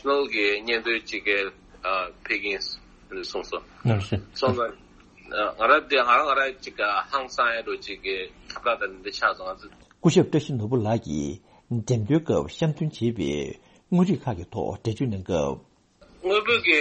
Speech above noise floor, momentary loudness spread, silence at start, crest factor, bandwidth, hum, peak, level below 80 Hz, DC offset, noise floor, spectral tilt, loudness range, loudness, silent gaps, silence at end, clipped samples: 31 dB; 13 LU; 0.05 s; 20 dB; 8.4 kHz; none; -6 dBFS; -52 dBFS; under 0.1%; -56 dBFS; -5.5 dB/octave; 5 LU; -25 LUFS; none; 0 s; under 0.1%